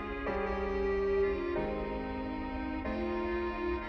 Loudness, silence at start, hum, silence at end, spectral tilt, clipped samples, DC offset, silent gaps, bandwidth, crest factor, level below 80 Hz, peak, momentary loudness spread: -34 LUFS; 0 s; none; 0 s; -8 dB/octave; under 0.1%; under 0.1%; none; 6.6 kHz; 12 dB; -44 dBFS; -22 dBFS; 7 LU